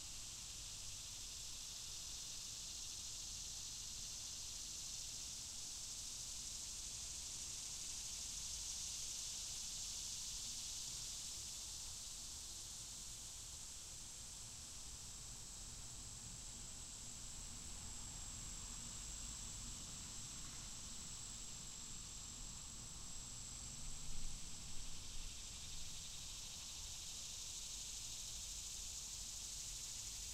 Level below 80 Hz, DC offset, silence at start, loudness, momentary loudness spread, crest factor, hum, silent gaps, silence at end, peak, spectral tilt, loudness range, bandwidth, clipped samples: -58 dBFS; under 0.1%; 0 s; -48 LUFS; 6 LU; 18 dB; none; none; 0 s; -32 dBFS; -0.5 dB/octave; 5 LU; 16 kHz; under 0.1%